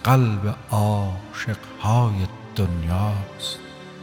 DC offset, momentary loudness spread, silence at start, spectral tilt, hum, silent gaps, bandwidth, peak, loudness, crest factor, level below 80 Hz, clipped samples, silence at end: under 0.1%; 10 LU; 0 s; -6.5 dB/octave; none; none; 17.5 kHz; -6 dBFS; -24 LUFS; 16 dB; -42 dBFS; under 0.1%; 0 s